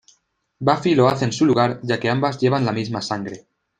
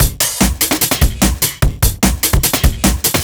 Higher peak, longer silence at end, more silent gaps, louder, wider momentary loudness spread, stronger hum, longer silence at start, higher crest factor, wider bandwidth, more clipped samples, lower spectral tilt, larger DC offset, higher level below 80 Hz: about the same, -2 dBFS vs 0 dBFS; first, 0.4 s vs 0 s; neither; second, -20 LUFS vs -14 LUFS; first, 10 LU vs 2 LU; neither; first, 0.6 s vs 0 s; about the same, 18 dB vs 14 dB; second, 9.6 kHz vs over 20 kHz; neither; first, -6 dB/octave vs -3.5 dB/octave; neither; second, -58 dBFS vs -18 dBFS